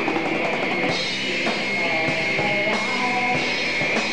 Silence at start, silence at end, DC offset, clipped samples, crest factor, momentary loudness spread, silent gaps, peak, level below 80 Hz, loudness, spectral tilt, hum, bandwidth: 0 s; 0 s; 1%; under 0.1%; 12 dB; 2 LU; none; -10 dBFS; -58 dBFS; -21 LUFS; -3.5 dB/octave; none; 14 kHz